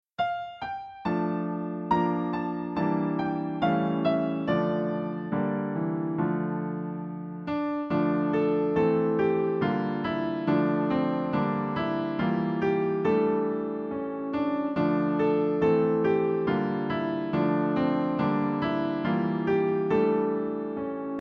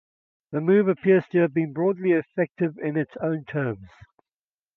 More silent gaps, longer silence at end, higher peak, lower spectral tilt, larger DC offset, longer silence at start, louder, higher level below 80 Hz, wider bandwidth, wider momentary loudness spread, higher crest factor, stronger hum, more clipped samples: neither; second, 0 s vs 0.9 s; second, -12 dBFS vs -8 dBFS; about the same, -9.5 dB/octave vs -10.5 dB/octave; neither; second, 0.2 s vs 0.5 s; second, -27 LUFS vs -24 LUFS; first, -60 dBFS vs -66 dBFS; first, 6 kHz vs 4 kHz; about the same, 7 LU vs 9 LU; about the same, 14 dB vs 16 dB; neither; neither